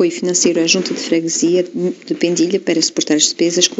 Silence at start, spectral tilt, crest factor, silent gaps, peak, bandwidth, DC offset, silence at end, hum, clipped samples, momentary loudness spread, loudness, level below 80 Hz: 0 s; -3 dB/octave; 16 dB; none; 0 dBFS; 8.2 kHz; under 0.1%; 0 s; none; under 0.1%; 6 LU; -15 LUFS; -66 dBFS